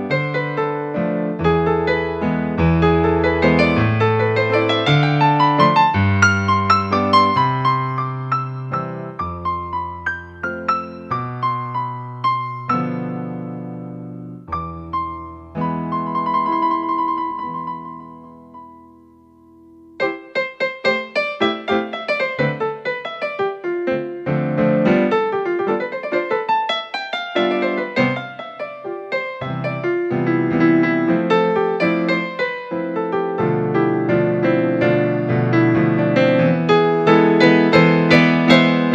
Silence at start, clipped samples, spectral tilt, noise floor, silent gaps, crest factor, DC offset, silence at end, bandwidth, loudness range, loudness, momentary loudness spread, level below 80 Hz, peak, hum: 0 s; under 0.1%; -7 dB/octave; -48 dBFS; none; 18 dB; under 0.1%; 0 s; 8.2 kHz; 10 LU; -18 LUFS; 13 LU; -44 dBFS; 0 dBFS; none